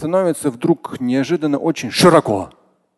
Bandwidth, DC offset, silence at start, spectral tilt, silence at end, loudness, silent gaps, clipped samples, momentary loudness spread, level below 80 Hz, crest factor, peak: 12.5 kHz; under 0.1%; 0 s; -5.5 dB/octave; 0.5 s; -17 LUFS; none; under 0.1%; 10 LU; -52 dBFS; 16 dB; 0 dBFS